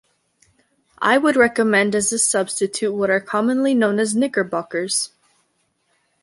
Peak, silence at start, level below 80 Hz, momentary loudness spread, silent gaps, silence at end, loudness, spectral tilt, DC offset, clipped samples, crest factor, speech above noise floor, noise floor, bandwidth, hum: -2 dBFS; 1 s; -62 dBFS; 7 LU; none; 1.15 s; -19 LUFS; -3 dB/octave; under 0.1%; under 0.1%; 18 dB; 49 dB; -67 dBFS; 11.5 kHz; none